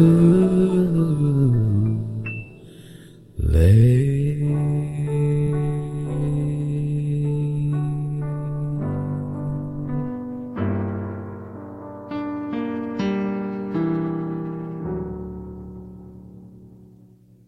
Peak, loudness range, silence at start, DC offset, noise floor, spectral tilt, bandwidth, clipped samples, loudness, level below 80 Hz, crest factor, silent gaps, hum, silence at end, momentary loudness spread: -4 dBFS; 9 LU; 0 s; under 0.1%; -50 dBFS; -9.5 dB/octave; 12 kHz; under 0.1%; -22 LUFS; -36 dBFS; 18 dB; none; none; 0.65 s; 19 LU